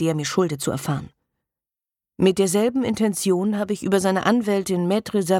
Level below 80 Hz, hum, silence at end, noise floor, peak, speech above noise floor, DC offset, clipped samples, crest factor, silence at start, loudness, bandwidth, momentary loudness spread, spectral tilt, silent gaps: -58 dBFS; none; 0 s; -90 dBFS; -4 dBFS; 69 dB; under 0.1%; under 0.1%; 18 dB; 0 s; -22 LUFS; 17 kHz; 5 LU; -5.5 dB/octave; none